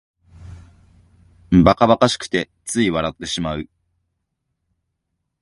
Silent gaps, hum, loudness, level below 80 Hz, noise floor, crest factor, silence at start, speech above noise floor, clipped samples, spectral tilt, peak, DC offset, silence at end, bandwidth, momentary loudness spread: none; none; -18 LUFS; -40 dBFS; -76 dBFS; 22 dB; 0.4 s; 59 dB; under 0.1%; -5.5 dB/octave; 0 dBFS; under 0.1%; 1.8 s; 11.5 kHz; 12 LU